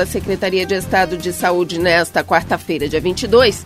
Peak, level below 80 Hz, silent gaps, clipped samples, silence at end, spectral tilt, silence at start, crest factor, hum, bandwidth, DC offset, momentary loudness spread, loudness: 0 dBFS; -38 dBFS; none; under 0.1%; 0 s; -4.5 dB/octave; 0 s; 16 dB; none; 16 kHz; under 0.1%; 6 LU; -16 LUFS